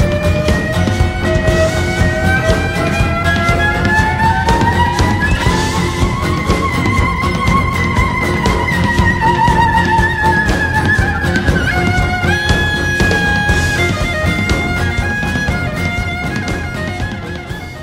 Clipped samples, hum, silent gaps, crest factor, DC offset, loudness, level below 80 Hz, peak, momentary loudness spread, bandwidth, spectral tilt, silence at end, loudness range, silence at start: under 0.1%; none; none; 14 dB; under 0.1%; -14 LUFS; -22 dBFS; 0 dBFS; 5 LU; 16 kHz; -5.5 dB/octave; 0 s; 3 LU; 0 s